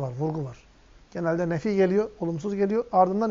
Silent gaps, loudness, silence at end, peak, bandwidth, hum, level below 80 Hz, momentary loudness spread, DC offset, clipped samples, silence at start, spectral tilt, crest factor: none; -26 LUFS; 0 s; -8 dBFS; 7.6 kHz; none; -56 dBFS; 10 LU; under 0.1%; under 0.1%; 0 s; -7.5 dB/octave; 18 dB